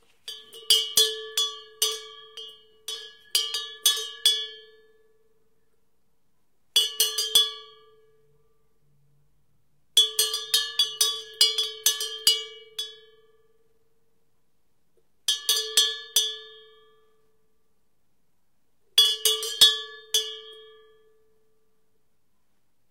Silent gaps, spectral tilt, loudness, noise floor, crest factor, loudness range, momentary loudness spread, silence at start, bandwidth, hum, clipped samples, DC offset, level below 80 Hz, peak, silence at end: none; 3.5 dB/octave; -22 LUFS; -76 dBFS; 26 dB; 5 LU; 20 LU; 0.25 s; 17 kHz; none; under 0.1%; under 0.1%; -78 dBFS; -4 dBFS; 2.25 s